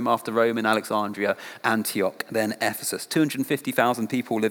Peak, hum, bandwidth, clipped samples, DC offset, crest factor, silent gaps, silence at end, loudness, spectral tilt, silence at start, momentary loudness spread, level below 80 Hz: -4 dBFS; none; over 20 kHz; under 0.1%; under 0.1%; 20 dB; none; 0 s; -25 LUFS; -4 dB/octave; 0 s; 5 LU; -82 dBFS